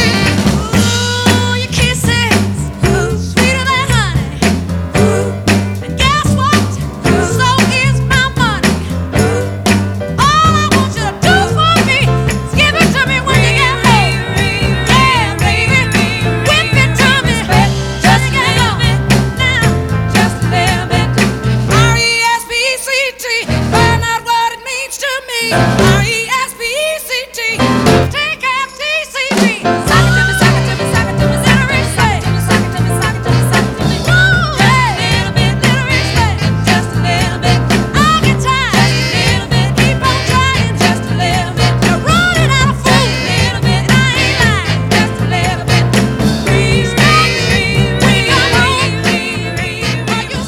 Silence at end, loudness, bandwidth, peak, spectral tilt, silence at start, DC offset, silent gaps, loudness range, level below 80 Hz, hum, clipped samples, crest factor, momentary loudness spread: 0 s; -11 LUFS; 17 kHz; 0 dBFS; -4.5 dB/octave; 0 s; under 0.1%; none; 2 LU; -26 dBFS; none; under 0.1%; 12 dB; 5 LU